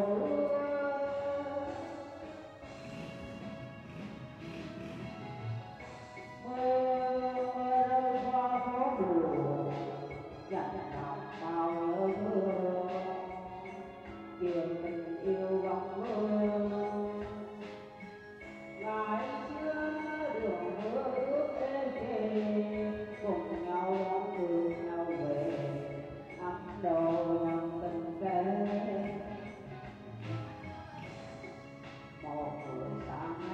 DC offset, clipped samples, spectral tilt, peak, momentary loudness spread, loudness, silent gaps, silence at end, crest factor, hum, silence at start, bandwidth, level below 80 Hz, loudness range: under 0.1%; under 0.1%; -8 dB/octave; -18 dBFS; 15 LU; -35 LUFS; none; 0 s; 16 dB; none; 0 s; 8.6 kHz; -64 dBFS; 11 LU